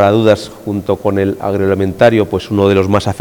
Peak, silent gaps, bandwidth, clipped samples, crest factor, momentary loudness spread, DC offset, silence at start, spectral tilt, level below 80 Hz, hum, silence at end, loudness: 0 dBFS; none; 19 kHz; under 0.1%; 12 dB; 6 LU; under 0.1%; 0 s; -7 dB/octave; -44 dBFS; none; 0 s; -13 LUFS